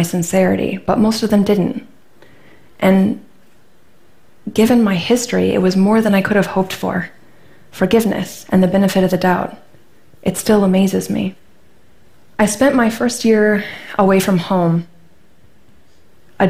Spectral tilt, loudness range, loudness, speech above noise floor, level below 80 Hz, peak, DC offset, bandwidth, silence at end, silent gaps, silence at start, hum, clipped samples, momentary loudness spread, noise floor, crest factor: -6 dB/octave; 3 LU; -15 LUFS; 39 dB; -46 dBFS; -2 dBFS; under 0.1%; 16 kHz; 0 s; none; 0 s; none; under 0.1%; 9 LU; -53 dBFS; 14 dB